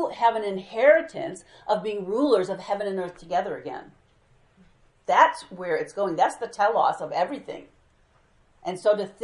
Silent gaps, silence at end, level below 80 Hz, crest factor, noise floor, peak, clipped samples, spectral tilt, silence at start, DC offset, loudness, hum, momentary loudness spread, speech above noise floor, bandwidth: none; 0 s; -66 dBFS; 22 dB; -61 dBFS; -4 dBFS; under 0.1%; -5 dB/octave; 0 s; under 0.1%; -24 LUFS; none; 17 LU; 37 dB; 11.5 kHz